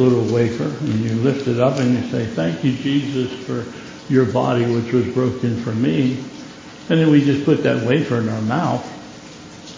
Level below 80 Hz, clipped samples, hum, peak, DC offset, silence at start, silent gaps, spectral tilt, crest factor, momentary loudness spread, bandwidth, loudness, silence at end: -52 dBFS; under 0.1%; none; -2 dBFS; under 0.1%; 0 s; none; -7.5 dB/octave; 16 dB; 17 LU; 7.6 kHz; -19 LUFS; 0 s